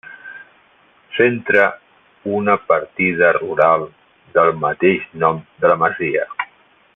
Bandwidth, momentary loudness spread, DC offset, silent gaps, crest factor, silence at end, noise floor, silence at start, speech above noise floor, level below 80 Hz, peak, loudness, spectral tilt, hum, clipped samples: 3.9 kHz; 14 LU; under 0.1%; none; 18 dB; 0.5 s; -53 dBFS; 0.1 s; 37 dB; -60 dBFS; 0 dBFS; -17 LUFS; -8.5 dB/octave; none; under 0.1%